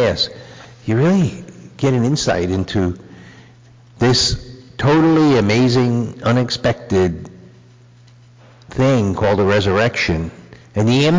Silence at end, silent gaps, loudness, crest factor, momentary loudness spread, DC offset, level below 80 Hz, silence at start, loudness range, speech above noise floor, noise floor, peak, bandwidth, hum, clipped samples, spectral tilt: 0 s; none; -16 LUFS; 10 dB; 16 LU; under 0.1%; -38 dBFS; 0 s; 4 LU; 30 dB; -45 dBFS; -6 dBFS; 7.6 kHz; none; under 0.1%; -5.5 dB/octave